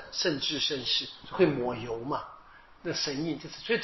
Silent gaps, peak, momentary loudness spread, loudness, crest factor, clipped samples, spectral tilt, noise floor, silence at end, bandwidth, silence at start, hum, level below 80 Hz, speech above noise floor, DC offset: none; -10 dBFS; 11 LU; -30 LUFS; 20 dB; under 0.1%; -2.5 dB/octave; -53 dBFS; 0 s; 6.2 kHz; 0 s; none; -60 dBFS; 23 dB; under 0.1%